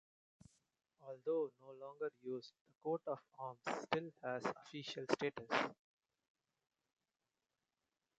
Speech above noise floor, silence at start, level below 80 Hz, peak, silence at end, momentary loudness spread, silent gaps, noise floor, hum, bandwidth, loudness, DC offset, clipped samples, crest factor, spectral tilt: over 46 dB; 1 s; -86 dBFS; -20 dBFS; 2.45 s; 12 LU; 2.61-2.65 s; under -90 dBFS; none; 9 kHz; -44 LUFS; under 0.1%; under 0.1%; 28 dB; -5 dB/octave